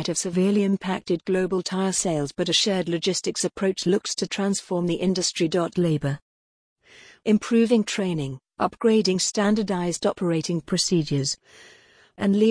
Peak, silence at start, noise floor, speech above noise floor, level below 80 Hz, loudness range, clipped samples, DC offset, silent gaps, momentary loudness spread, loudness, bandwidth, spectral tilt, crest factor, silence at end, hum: -8 dBFS; 0 s; under -90 dBFS; over 67 dB; -58 dBFS; 2 LU; under 0.1%; under 0.1%; 6.22-6.76 s; 7 LU; -24 LUFS; 10.5 kHz; -4.5 dB/octave; 16 dB; 0 s; none